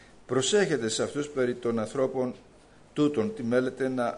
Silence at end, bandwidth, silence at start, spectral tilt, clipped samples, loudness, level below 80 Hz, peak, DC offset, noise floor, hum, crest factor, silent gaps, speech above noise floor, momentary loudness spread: 0 s; 10.5 kHz; 0.3 s; -4.5 dB/octave; under 0.1%; -28 LUFS; -62 dBFS; -12 dBFS; under 0.1%; -53 dBFS; none; 16 dB; none; 26 dB; 7 LU